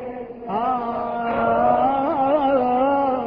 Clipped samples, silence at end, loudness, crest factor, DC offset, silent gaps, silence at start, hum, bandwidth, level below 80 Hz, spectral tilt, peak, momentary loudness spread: under 0.1%; 0 s; -20 LUFS; 14 dB; under 0.1%; none; 0 s; none; 5.2 kHz; -50 dBFS; -9.5 dB/octave; -6 dBFS; 8 LU